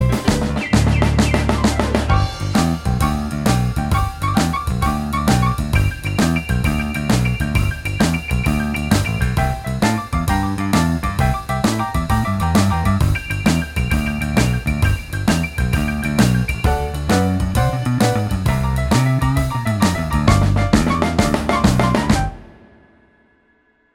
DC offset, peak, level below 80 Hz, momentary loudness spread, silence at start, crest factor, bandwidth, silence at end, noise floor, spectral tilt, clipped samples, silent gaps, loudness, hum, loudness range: under 0.1%; 0 dBFS; -24 dBFS; 4 LU; 0 s; 18 dB; 18 kHz; 1.5 s; -59 dBFS; -6 dB/octave; under 0.1%; none; -18 LUFS; none; 2 LU